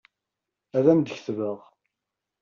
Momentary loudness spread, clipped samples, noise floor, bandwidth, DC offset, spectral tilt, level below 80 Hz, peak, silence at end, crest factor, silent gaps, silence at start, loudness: 12 LU; under 0.1%; -86 dBFS; 7.2 kHz; under 0.1%; -7.5 dB/octave; -72 dBFS; -6 dBFS; 0.85 s; 20 dB; none; 0.75 s; -24 LUFS